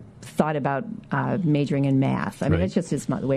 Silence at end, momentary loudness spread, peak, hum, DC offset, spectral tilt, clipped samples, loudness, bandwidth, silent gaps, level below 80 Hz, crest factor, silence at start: 0 s; 6 LU; -4 dBFS; none; under 0.1%; -7.5 dB/octave; under 0.1%; -24 LUFS; 12 kHz; none; -52 dBFS; 20 dB; 0 s